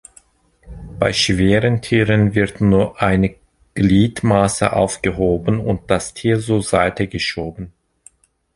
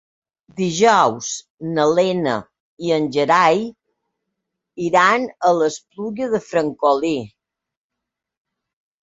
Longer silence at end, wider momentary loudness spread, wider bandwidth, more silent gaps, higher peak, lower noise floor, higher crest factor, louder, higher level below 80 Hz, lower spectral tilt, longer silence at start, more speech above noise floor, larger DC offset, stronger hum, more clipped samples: second, 0.85 s vs 1.75 s; second, 7 LU vs 14 LU; first, 11.5 kHz vs 8 kHz; second, none vs 1.50-1.58 s, 2.60-2.77 s; about the same, -2 dBFS vs 0 dBFS; second, -53 dBFS vs -83 dBFS; about the same, 16 dB vs 20 dB; about the same, -17 LUFS vs -18 LUFS; first, -36 dBFS vs -62 dBFS; about the same, -5.5 dB/octave vs -4.5 dB/octave; about the same, 0.65 s vs 0.55 s; second, 37 dB vs 65 dB; neither; neither; neither